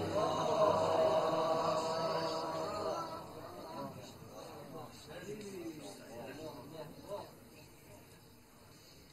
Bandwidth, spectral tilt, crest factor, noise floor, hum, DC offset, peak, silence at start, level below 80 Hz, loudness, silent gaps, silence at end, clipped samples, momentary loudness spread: 12.5 kHz; -5 dB/octave; 20 dB; -60 dBFS; none; under 0.1%; -18 dBFS; 0 s; -68 dBFS; -37 LUFS; none; 0 s; under 0.1%; 25 LU